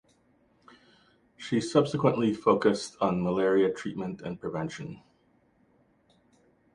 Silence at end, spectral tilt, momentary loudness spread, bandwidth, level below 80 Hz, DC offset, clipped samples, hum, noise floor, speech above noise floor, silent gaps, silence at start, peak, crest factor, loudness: 1.75 s; -6.5 dB/octave; 13 LU; 11 kHz; -64 dBFS; under 0.1%; under 0.1%; none; -66 dBFS; 39 dB; none; 1.4 s; -6 dBFS; 22 dB; -28 LUFS